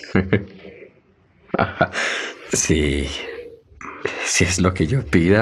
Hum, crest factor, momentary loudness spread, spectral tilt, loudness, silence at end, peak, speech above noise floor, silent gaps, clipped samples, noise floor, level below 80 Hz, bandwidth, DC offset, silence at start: none; 20 dB; 20 LU; -4.5 dB/octave; -20 LUFS; 0 s; -2 dBFS; 37 dB; none; under 0.1%; -56 dBFS; -38 dBFS; 14 kHz; under 0.1%; 0 s